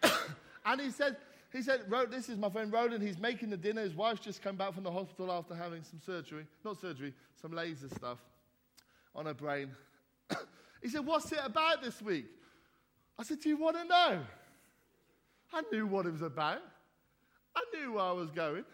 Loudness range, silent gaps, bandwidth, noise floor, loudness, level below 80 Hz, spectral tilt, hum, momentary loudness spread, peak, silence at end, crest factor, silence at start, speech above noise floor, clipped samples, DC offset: 10 LU; none; 16.5 kHz; -73 dBFS; -37 LUFS; -78 dBFS; -4.5 dB/octave; none; 14 LU; -14 dBFS; 0 s; 24 dB; 0 s; 37 dB; under 0.1%; under 0.1%